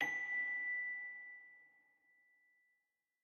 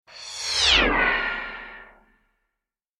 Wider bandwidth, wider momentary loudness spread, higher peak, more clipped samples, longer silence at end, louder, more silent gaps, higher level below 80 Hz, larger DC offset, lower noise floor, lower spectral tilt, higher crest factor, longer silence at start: second, 11.5 kHz vs 13.5 kHz; second, 17 LU vs 20 LU; second, -26 dBFS vs -6 dBFS; neither; first, 1.55 s vs 1.15 s; second, -40 LUFS vs -20 LUFS; neither; second, under -90 dBFS vs -40 dBFS; neither; about the same, -87 dBFS vs -85 dBFS; about the same, -2 dB/octave vs -1.5 dB/octave; about the same, 20 dB vs 20 dB; about the same, 0 s vs 0.1 s